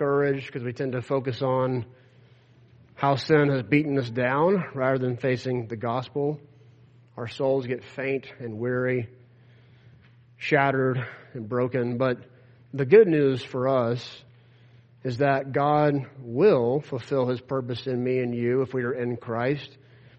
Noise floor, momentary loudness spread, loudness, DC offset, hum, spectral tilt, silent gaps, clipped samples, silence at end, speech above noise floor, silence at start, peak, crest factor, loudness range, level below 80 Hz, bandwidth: -55 dBFS; 12 LU; -25 LUFS; under 0.1%; none; -8 dB/octave; none; under 0.1%; 0.5 s; 31 dB; 0 s; -4 dBFS; 22 dB; 6 LU; -66 dBFS; 8.2 kHz